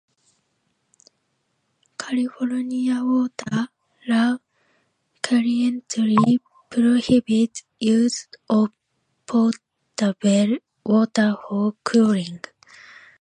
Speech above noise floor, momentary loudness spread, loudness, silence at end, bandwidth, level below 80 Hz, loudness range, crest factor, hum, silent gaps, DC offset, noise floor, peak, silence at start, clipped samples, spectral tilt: 52 dB; 13 LU; -21 LUFS; 0.85 s; 10.5 kHz; -64 dBFS; 6 LU; 18 dB; none; none; under 0.1%; -72 dBFS; -4 dBFS; 2 s; under 0.1%; -5.5 dB/octave